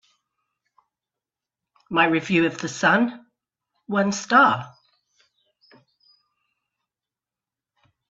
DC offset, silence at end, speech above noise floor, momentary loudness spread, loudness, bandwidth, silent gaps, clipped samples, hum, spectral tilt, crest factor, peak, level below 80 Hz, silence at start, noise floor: under 0.1%; 3.45 s; 69 dB; 10 LU; -20 LUFS; 8 kHz; none; under 0.1%; none; -4.5 dB/octave; 22 dB; -4 dBFS; -68 dBFS; 1.9 s; -90 dBFS